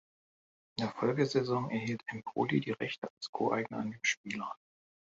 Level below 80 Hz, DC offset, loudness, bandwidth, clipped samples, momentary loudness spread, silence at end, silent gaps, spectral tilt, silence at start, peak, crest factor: -74 dBFS; under 0.1%; -35 LUFS; 8 kHz; under 0.1%; 10 LU; 0.6 s; 2.98-3.02 s, 3.10-3.17 s, 3.29-3.33 s, 4.17-4.24 s; -5 dB/octave; 0.75 s; -16 dBFS; 20 dB